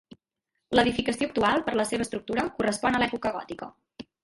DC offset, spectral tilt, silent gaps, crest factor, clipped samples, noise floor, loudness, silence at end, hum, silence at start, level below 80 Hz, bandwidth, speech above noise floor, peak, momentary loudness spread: under 0.1%; -4 dB/octave; none; 22 dB; under 0.1%; -82 dBFS; -26 LUFS; 0.2 s; none; 0.7 s; -54 dBFS; 11.5 kHz; 56 dB; -6 dBFS; 16 LU